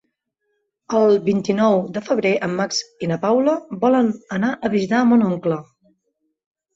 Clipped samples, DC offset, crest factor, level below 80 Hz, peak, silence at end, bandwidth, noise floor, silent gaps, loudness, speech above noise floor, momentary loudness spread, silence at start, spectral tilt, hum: under 0.1%; under 0.1%; 16 dB; -62 dBFS; -4 dBFS; 1.15 s; 7.8 kHz; -73 dBFS; none; -19 LUFS; 55 dB; 7 LU; 0.9 s; -6 dB/octave; none